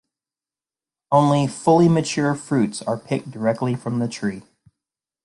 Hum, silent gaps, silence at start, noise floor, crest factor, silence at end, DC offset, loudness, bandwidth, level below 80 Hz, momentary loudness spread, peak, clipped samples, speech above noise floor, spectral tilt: none; none; 1.1 s; under -90 dBFS; 20 dB; 0.85 s; under 0.1%; -20 LUFS; 11.5 kHz; -60 dBFS; 11 LU; -2 dBFS; under 0.1%; over 70 dB; -6.5 dB/octave